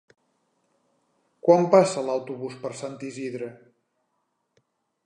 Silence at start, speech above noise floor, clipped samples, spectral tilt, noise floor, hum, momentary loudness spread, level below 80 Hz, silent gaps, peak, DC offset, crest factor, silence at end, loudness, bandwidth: 1.45 s; 52 dB; under 0.1%; -6 dB/octave; -75 dBFS; none; 17 LU; -80 dBFS; none; -4 dBFS; under 0.1%; 24 dB; 1.5 s; -24 LUFS; 10.5 kHz